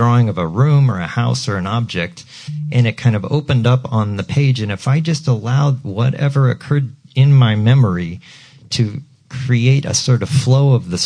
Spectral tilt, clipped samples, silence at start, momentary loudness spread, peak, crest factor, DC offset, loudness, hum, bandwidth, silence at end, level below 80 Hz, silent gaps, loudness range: -6 dB/octave; under 0.1%; 0 s; 10 LU; -4 dBFS; 12 dB; under 0.1%; -16 LUFS; none; 10.5 kHz; 0 s; -48 dBFS; none; 2 LU